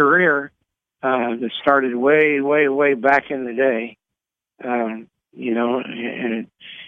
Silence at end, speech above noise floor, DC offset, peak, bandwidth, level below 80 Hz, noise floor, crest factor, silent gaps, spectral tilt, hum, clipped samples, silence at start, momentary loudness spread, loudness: 0 s; 65 dB; under 0.1%; -2 dBFS; 6 kHz; -70 dBFS; -85 dBFS; 18 dB; none; -7 dB/octave; none; under 0.1%; 0 s; 14 LU; -19 LUFS